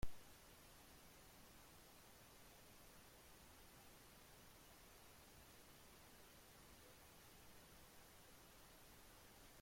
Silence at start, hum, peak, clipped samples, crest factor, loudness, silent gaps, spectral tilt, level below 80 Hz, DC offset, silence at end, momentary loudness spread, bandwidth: 0 s; none; -32 dBFS; under 0.1%; 26 dB; -64 LUFS; none; -3 dB/octave; -68 dBFS; under 0.1%; 0 s; 0 LU; 16.5 kHz